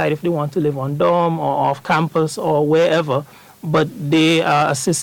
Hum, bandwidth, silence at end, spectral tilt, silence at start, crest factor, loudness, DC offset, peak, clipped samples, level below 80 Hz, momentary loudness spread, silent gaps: none; 17.5 kHz; 0 s; -5 dB/octave; 0 s; 12 dB; -17 LUFS; under 0.1%; -4 dBFS; under 0.1%; -58 dBFS; 6 LU; none